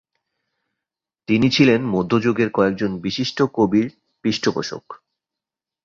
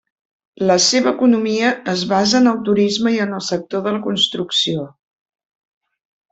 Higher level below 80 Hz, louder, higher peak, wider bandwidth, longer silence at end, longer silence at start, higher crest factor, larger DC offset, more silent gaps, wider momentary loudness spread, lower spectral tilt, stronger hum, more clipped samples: first, -54 dBFS vs -60 dBFS; second, -19 LUFS vs -16 LUFS; about the same, -2 dBFS vs -2 dBFS; second, 7.6 kHz vs 8.4 kHz; second, 0.9 s vs 1.45 s; first, 1.3 s vs 0.6 s; about the same, 20 dB vs 16 dB; neither; neither; first, 12 LU vs 8 LU; first, -6 dB/octave vs -3.5 dB/octave; neither; neither